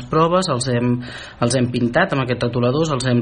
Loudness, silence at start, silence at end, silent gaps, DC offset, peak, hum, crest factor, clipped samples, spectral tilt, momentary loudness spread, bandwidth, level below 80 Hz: -19 LUFS; 0 s; 0 s; none; under 0.1%; -2 dBFS; none; 16 dB; under 0.1%; -5.5 dB/octave; 5 LU; 10 kHz; -44 dBFS